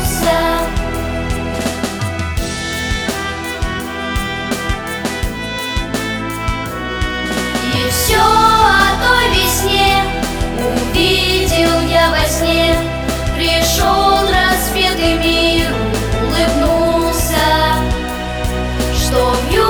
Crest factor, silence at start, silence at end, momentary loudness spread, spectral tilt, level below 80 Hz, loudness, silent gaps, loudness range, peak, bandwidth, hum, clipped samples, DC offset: 14 dB; 0 s; 0 s; 9 LU; -4 dB/octave; -24 dBFS; -14 LUFS; none; 8 LU; 0 dBFS; over 20 kHz; none; under 0.1%; under 0.1%